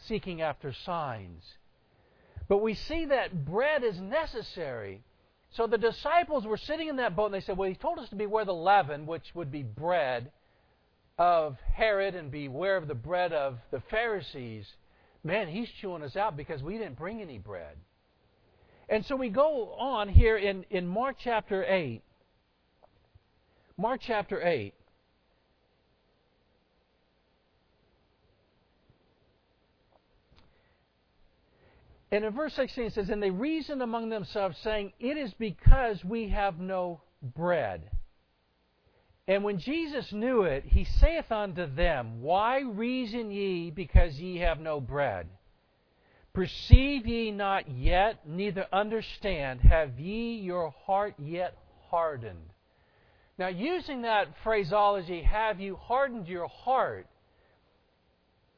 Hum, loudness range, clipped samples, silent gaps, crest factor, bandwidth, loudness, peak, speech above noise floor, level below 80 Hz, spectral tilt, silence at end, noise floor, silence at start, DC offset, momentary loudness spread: none; 7 LU; under 0.1%; none; 28 dB; 5.4 kHz; -30 LUFS; -2 dBFS; 43 dB; -34 dBFS; -8 dB/octave; 1.55 s; -71 dBFS; 0 s; under 0.1%; 12 LU